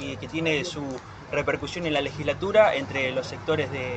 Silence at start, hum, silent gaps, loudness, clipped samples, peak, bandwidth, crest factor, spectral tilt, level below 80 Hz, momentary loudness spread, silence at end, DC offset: 0 s; none; none; -26 LUFS; under 0.1%; -6 dBFS; 8.6 kHz; 20 dB; -5 dB/octave; -52 dBFS; 12 LU; 0 s; under 0.1%